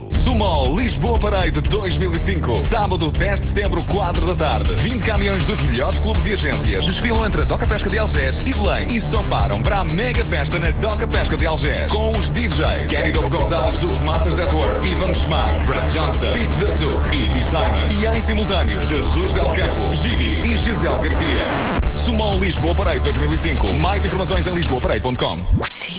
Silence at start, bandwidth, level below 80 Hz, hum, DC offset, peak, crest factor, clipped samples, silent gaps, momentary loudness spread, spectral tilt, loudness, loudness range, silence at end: 0 s; 4 kHz; -22 dBFS; none; under 0.1%; -6 dBFS; 12 dB; under 0.1%; none; 2 LU; -10.5 dB/octave; -19 LUFS; 1 LU; 0 s